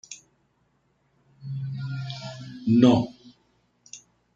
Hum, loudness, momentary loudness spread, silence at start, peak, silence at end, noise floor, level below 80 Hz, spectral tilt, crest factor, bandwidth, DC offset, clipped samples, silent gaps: none; -25 LUFS; 27 LU; 0.1 s; -6 dBFS; 0.4 s; -69 dBFS; -64 dBFS; -7 dB/octave; 22 dB; 7.6 kHz; under 0.1%; under 0.1%; none